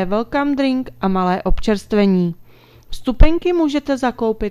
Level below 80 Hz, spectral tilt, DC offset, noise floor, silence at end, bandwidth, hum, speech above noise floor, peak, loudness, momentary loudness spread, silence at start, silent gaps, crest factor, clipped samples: -24 dBFS; -7 dB/octave; under 0.1%; -44 dBFS; 0 s; 11 kHz; none; 29 dB; 0 dBFS; -18 LUFS; 8 LU; 0 s; none; 16 dB; 0.1%